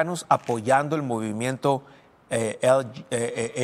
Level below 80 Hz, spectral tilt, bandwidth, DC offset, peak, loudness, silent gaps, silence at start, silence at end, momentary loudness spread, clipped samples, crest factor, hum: -66 dBFS; -5 dB/octave; 15 kHz; under 0.1%; -4 dBFS; -25 LUFS; none; 0 s; 0 s; 7 LU; under 0.1%; 20 dB; none